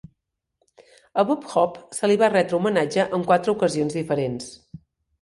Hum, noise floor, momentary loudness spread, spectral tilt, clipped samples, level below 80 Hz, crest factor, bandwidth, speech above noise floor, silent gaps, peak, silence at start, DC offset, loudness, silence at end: none; -76 dBFS; 8 LU; -5.5 dB/octave; under 0.1%; -62 dBFS; 18 dB; 11.5 kHz; 55 dB; none; -4 dBFS; 1.15 s; under 0.1%; -22 LUFS; 0.45 s